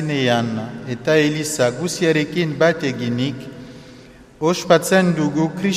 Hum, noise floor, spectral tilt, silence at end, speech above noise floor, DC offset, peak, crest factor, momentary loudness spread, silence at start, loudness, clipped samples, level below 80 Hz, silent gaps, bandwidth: none; -43 dBFS; -5 dB/octave; 0 s; 25 dB; under 0.1%; 0 dBFS; 18 dB; 12 LU; 0 s; -19 LUFS; under 0.1%; -54 dBFS; none; 15.5 kHz